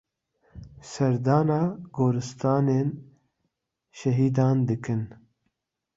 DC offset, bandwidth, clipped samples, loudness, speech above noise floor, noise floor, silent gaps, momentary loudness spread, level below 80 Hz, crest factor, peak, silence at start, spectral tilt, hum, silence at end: under 0.1%; 7.8 kHz; under 0.1%; -25 LUFS; 55 dB; -79 dBFS; none; 11 LU; -60 dBFS; 18 dB; -8 dBFS; 0.55 s; -8 dB/octave; none; 0.8 s